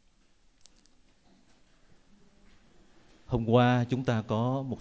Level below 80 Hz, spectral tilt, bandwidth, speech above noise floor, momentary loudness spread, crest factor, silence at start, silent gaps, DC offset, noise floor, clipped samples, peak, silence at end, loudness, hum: -56 dBFS; -8 dB/octave; 8 kHz; 37 dB; 9 LU; 22 dB; 3.3 s; none; under 0.1%; -64 dBFS; under 0.1%; -10 dBFS; 0 s; -28 LUFS; none